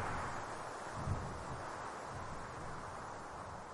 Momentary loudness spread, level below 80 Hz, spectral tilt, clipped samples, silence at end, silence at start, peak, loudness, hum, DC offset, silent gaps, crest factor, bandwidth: 6 LU; -56 dBFS; -5 dB/octave; under 0.1%; 0 s; 0 s; -26 dBFS; -45 LUFS; none; under 0.1%; none; 18 dB; 11.5 kHz